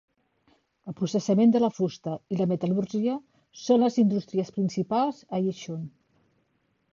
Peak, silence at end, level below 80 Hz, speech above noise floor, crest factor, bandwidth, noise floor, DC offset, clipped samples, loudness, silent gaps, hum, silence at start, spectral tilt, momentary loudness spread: -10 dBFS; 1.05 s; -70 dBFS; 46 dB; 16 dB; 7.4 kHz; -72 dBFS; under 0.1%; under 0.1%; -26 LUFS; none; none; 0.85 s; -7.5 dB/octave; 15 LU